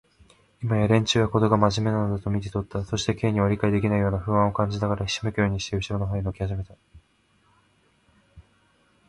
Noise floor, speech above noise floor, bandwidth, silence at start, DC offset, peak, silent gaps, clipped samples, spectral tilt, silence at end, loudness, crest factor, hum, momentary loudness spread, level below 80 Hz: -64 dBFS; 41 dB; 11 kHz; 0.6 s; under 0.1%; -4 dBFS; none; under 0.1%; -6 dB/octave; 0.7 s; -24 LUFS; 20 dB; none; 9 LU; -44 dBFS